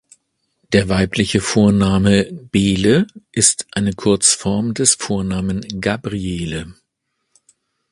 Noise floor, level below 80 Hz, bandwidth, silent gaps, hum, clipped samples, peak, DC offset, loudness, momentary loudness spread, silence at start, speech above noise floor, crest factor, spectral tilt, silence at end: -73 dBFS; -38 dBFS; 11.5 kHz; none; none; under 0.1%; 0 dBFS; under 0.1%; -16 LUFS; 9 LU; 0.7 s; 57 dB; 18 dB; -4 dB/octave; 1.2 s